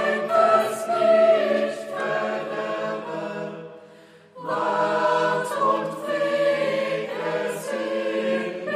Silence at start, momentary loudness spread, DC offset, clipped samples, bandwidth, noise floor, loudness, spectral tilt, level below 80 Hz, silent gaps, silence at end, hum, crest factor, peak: 0 s; 12 LU; under 0.1%; under 0.1%; 15 kHz; -49 dBFS; -23 LUFS; -4.5 dB/octave; -82 dBFS; none; 0 s; none; 18 dB; -6 dBFS